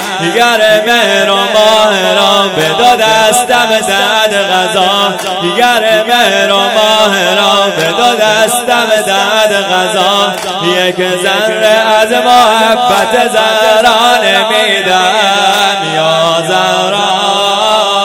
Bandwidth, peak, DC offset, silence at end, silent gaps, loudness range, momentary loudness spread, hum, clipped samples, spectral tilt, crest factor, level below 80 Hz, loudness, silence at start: over 20 kHz; 0 dBFS; under 0.1%; 0 s; none; 2 LU; 4 LU; none; 2%; -2 dB/octave; 8 dB; -50 dBFS; -8 LUFS; 0 s